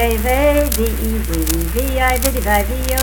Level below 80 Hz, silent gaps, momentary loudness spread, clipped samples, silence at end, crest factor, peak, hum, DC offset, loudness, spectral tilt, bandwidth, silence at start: -20 dBFS; none; 5 LU; under 0.1%; 0 s; 16 dB; 0 dBFS; none; under 0.1%; -17 LUFS; -4.5 dB/octave; 19.5 kHz; 0 s